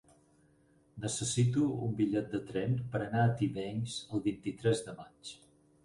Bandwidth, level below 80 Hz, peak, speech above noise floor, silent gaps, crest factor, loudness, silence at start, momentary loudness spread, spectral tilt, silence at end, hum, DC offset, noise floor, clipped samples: 11.5 kHz; -64 dBFS; -16 dBFS; 34 dB; none; 18 dB; -33 LUFS; 0.95 s; 14 LU; -6 dB/octave; 0.5 s; none; under 0.1%; -67 dBFS; under 0.1%